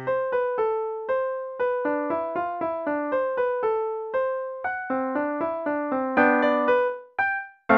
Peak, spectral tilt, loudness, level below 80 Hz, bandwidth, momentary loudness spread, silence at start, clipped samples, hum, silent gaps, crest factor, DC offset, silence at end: -6 dBFS; -7.5 dB/octave; -25 LUFS; -66 dBFS; 5.2 kHz; 7 LU; 0 s; under 0.1%; none; none; 20 dB; under 0.1%; 0 s